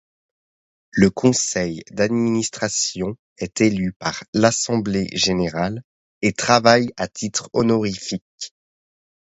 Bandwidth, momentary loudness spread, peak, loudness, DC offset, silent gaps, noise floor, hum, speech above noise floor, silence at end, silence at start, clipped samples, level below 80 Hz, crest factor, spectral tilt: 8.2 kHz; 13 LU; 0 dBFS; -20 LUFS; under 0.1%; 3.19-3.36 s, 3.96-4.00 s, 4.28-4.33 s, 5.84-6.21 s, 8.22-8.38 s; under -90 dBFS; none; over 70 dB; 0.85 s; 0.95 s; under 0.1%; -50 dBFS; 20 dB; -4 dB/octave